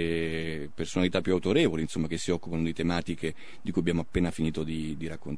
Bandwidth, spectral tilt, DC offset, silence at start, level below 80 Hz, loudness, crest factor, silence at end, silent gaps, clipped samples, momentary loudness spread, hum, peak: 10.5 kHz; -6 dB/octave; 1%; 0 s; -48 dBFS; -30 LUFS; 20 dB; 0 s; none; under 0.1%; 10 LU; none; -10 dBFS